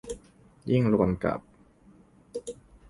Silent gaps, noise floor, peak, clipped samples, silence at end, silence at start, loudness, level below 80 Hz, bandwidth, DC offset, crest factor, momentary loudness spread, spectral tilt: none; -57 dBFS; -10 dBFS; under 0.1%; 0.35 s; 0.05 s; -28 LUFS; -50 dBFS; 11.5 kHz; under 0.1%; 20 dB; 19 LU; -8 dB/octave